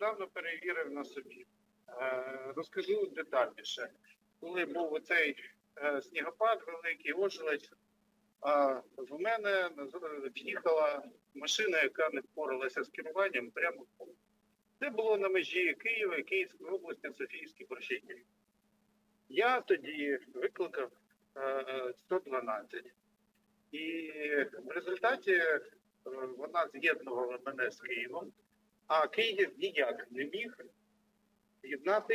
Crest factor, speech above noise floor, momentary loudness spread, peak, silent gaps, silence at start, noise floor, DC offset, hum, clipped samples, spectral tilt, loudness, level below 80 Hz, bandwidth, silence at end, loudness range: 20 dB; 40 dB; 14 LU; -18 dBFS; none; 0 s; -75 dBFS; under 0.1%; none; under 0.1%; -2.5 dB/octave; -35 LUFS; under -90 dBFS; 16 kHz; 0 s; 5 LU